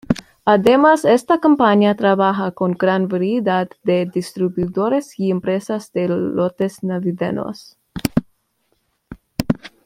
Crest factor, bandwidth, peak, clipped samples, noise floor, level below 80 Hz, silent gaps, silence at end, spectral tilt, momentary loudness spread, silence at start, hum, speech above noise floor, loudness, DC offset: 18 dB; 16 kHz; 0 dBFS; under 0.1%; -66 dBFS; -50 dBFS; none; 0.2 s; -6.5 dB/octave; 11 LU; 0.1 s; none; 50 dB; -18 LUFS; under 0.1%